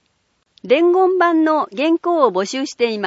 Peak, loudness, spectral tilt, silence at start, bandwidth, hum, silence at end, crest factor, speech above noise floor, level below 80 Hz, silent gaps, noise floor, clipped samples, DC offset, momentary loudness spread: 0 dBFS; -16 LUFS; -4.5 dB/octave; 0.65 s; 8 kHz; none; 0 s; 16 dB; 50 dB; -74 dBFS; none; -66 dBFS; under 0.1%; under 0.1%; 6 LU